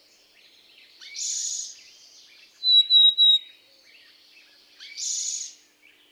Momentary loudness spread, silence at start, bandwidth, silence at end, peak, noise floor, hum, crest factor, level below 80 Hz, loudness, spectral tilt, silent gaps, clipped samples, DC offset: 24 LU; 1 s; 14.5 kHz; 0.6 s; -10 dBFS; -58 dBFS; none; 16 dB; under -90 dBFS; -19 LUFS; 6 dB/octave; none; under 0.1%; under 0.1%